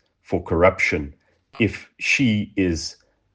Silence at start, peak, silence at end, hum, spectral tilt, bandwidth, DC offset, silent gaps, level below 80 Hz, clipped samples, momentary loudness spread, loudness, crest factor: 0.3 s; -2 dBFS; 0.45 s; none; -5 dB/octave; 10 kHz; under 0.1%; none; -46 dBFS; under 0.1%; 11 LU; -21 LUFS; 20 dB